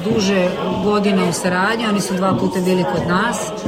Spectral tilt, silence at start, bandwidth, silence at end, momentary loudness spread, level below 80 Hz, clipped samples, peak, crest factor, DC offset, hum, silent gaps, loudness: -5 dB/octave; 0 s; 16 kHz; 0 s; 2 LU; -46 dBFS; under 0.1%; -4 dBFS; 14 dB; under 0.1%; none; none; -17 LUFS